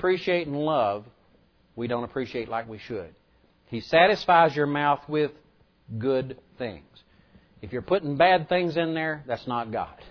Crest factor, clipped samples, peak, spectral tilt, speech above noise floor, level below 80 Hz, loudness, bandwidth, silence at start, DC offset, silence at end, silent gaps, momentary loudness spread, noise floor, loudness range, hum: 20 dB; under 0.1%; -6 dBFS; -7 dB/octave; 36 dB; -58 dBFS; -25 LUFS; 5.4 kHz; 0 s; under 0.1%; 0 s; none; 17 LU; -62 dBFS; 7 LU; none